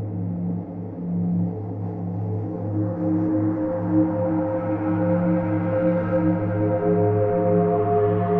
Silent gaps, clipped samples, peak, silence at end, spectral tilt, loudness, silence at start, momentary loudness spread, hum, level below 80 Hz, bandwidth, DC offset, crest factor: none; under 0.1%; -8 dBFS; 0 s; -13 dB/octave; -23 LUFS; 0 s; 8 LU; none; -52 dBFS; 3.2 kHz; under 0.1%; 14 dB